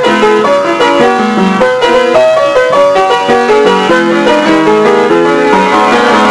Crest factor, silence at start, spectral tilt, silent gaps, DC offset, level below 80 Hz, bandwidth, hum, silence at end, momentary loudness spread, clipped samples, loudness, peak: 6 dB; 0 s; -4.5 dB/octave; none; under 0.1%; -42 dBFS; 11 kHz; none; 0 s; 2 LU; 1%; -7 LUFS; 0 dBFS